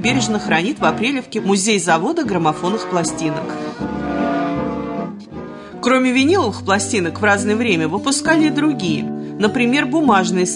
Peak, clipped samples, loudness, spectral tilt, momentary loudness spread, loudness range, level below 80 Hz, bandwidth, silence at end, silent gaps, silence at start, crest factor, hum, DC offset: -2 dBFS; under 0.1%; -17 LUFS; -4 dB/octave; 10 LU; 5 LU; -50 dBFS; 11 kHz; 0 s; none; 0 s; 14 dB; none; under 0.1%